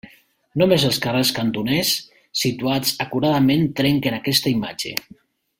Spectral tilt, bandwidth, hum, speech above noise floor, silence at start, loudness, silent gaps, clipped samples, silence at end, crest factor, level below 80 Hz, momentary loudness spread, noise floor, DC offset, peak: -4.5 dB/octave; 16.5 kHz; none; 30 dB; 0.05 s; -20 LUFS; none; under 0.1%; 0.6 s; 20 dB; -54 dBFS; 9 LU; -49 dBFS; under 0.1%; 0 dBFS